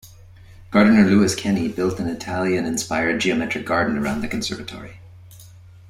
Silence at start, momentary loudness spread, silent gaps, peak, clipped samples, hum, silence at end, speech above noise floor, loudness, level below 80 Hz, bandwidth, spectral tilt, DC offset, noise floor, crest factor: 0.05 s; 13 LU; none; -2 dBFS; under 0.1%; none; 0.4 s; 25 dB; -20 LUFS; -48 dBFS; 15.5 kHz; -5 dB/octave; under 0.1%; -44 dBFS; 18 dB